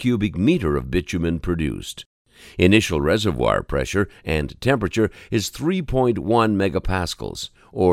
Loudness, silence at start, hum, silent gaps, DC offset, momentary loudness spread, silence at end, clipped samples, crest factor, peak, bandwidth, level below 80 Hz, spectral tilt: -21 LUFS; 0 s; none; 2.06-2.25 s; under 0.1%; 11 LU; 0 s; under 0.1%; 20 dB; 0 dBFS; 16 kHz; -36 dBFS; -6 dB/octave